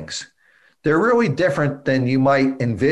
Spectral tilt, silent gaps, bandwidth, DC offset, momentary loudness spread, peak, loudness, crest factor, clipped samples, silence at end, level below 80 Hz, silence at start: -6.5 dB/octave; none; 11 kHz; under 0.1%; 9 LU; -6 dBFS; -18 LUFS; 12 dB; under 0.1%; 0 s; -52 dBFS; 0 s